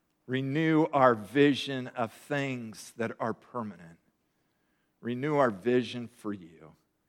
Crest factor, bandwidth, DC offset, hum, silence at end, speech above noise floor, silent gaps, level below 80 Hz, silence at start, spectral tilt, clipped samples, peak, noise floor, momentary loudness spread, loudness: 22 dB; 14.5 kHz; under 0.1%; none; 0.4 s; 46 dB; none; -78 dBFS; 0.3 s; -6.5 dB/octave; under 0.1%; -10 dBFS; -75 dBFS; 15 LU; -29 LUFS